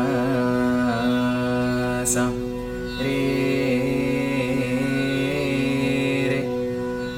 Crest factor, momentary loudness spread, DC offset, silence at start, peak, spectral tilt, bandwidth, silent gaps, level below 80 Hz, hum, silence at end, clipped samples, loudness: 14 dB; 5 LU; under 0.1%; 0 s; -8 dBFS; -5 dB/octave; 16.5 kHz; none; -42 dBFS; none; 0 s; under 0.1%; -23 LUFS